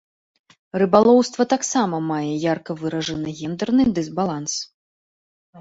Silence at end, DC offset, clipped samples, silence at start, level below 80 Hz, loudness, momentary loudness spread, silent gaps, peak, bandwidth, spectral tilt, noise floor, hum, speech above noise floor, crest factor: 0 s; under 0.1%; under 0.1%; 0.75 s; -56 dBFS; -21 LUFS; 12 LU; 4.74-5.53 s; -2 dBFS; 8 kHz; -5 dB/octave; under -90 dBFS; none; over 70 dB; 20 dB